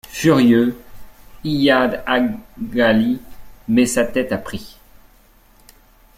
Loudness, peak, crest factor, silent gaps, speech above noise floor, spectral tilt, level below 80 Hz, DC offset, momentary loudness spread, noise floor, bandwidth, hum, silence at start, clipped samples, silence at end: -17 LUFS; -2 dBFS; 16 dB; none; 34 dB; -5 dB/octave; -44 dBFS; under 0.1%; 16 LU; -51 dBFS; 16 kHz; none; 0.1 s; under 0.1%; 1.5 s